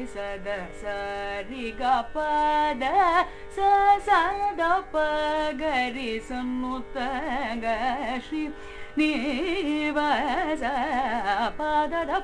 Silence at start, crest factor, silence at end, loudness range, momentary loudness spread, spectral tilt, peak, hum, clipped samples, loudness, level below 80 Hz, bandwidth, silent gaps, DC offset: 0 s; 18 dB; 0 s; 6 LU; 11 LU; -4.5 dB/octave; -8 dBFS; none; under 0.1%; -26 LUFS; -44 dBFS; 10.5 kHz; none; under 0.1%